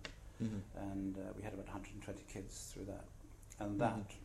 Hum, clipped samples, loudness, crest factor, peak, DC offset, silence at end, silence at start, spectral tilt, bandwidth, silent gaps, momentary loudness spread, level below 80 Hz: none; under 0.1%; -45 LUFS; 22 dB; -24 dBFS; under 0.1%; 0 s; 0 s; -6 dB/octave; 14 kHz; none; 14 LU; -58 dBFS